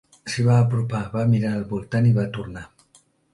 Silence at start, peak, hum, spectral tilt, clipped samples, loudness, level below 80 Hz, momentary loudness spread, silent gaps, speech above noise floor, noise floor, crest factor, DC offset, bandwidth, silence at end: 0.25 s; -6 dBFS; none; -7.5 dB/octave; under 0.1%; -22 LUFS; -50 dBFS; 13 LU; none; 38 dB; -59 dBFS; 16 dB; under 0.1%; 11.5 kHz; 0.65 s